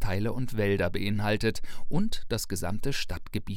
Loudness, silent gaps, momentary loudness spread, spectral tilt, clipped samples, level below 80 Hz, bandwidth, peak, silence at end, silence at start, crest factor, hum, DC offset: -30 LUFS; none; 7 LU; -5.5 dB/octave; under 0.1%; -38 dBFS; 16.5 kHz; -12 dBFS; 0 s; 0 s; 14 dB; none; under 0.1%